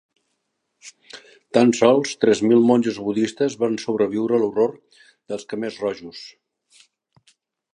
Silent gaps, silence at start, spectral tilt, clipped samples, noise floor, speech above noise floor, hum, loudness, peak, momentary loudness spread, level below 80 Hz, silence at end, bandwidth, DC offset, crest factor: none; 0.85 s; -5.5 dB/octave; under 0.1%; -75 dBFS; 55 dB; none; -20 LUFS; -2 dBFS; 23 LU; -66 dBFS; 1.45 s; 10.5 kHz; under 0.1%; 20 dB